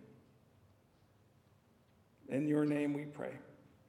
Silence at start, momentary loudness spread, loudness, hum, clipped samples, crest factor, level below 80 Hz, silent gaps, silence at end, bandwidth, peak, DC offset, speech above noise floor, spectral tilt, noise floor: 0 s; 24 LU; -37 LUFS; none; under 0.1%; 20 dB; -82 dBFS; none; 0.35 s; 11.5 kHz; -22 dBFS; under 0.1%; 33 dB; -8 dB/octave; -69 dBFS